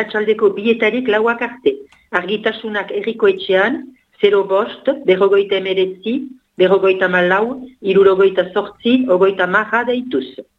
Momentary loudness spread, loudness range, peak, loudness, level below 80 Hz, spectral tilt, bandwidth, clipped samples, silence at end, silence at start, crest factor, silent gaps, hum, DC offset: 10 LU; 3 LU; 0 dBFS; -16 LUFS; -60 dBFS; -7 dB/octave; 5 kHz; under 0.1%; 0.15 s; 0 s; 16 dB; none; none; under 0.1%